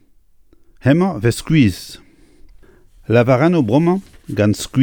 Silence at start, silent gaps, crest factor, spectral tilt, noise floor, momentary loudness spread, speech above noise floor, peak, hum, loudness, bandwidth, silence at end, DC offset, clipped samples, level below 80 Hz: 0.85 s; none; 16 dB; -7 dB/octave; -50 dBFS; 13 LU; 35 dB; 0 dBFS; none; -16 LUFS; 19 kHz; 0 s; under 0.1%; under 0.1%; -42 dBFS